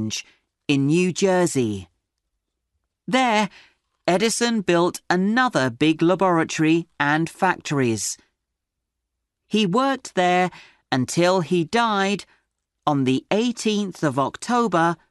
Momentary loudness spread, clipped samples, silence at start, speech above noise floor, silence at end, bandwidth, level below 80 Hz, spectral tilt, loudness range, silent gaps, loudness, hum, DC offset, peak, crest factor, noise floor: 7 LU; under 0.1%; 0 s; 61 dB; 0.15 s; 12 kHz; -62 dBFS; -4.5 dB/octave; 4 LU; none; -21 LUFS; none; under 0.1%; -4 dBFS; 18 dB; -81 dBFS